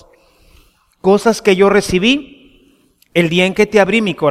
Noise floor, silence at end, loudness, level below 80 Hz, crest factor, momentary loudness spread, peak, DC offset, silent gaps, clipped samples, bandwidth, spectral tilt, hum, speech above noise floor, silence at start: -53 dBFS; 0 s; -13 LUFS; -42 dBFS; 14 dB; 6 LU; 0 dBFS; under 0.1%; none; under 0.1%; 15 kHz; -5 dB/octave; none; 41 dB; 1.05 s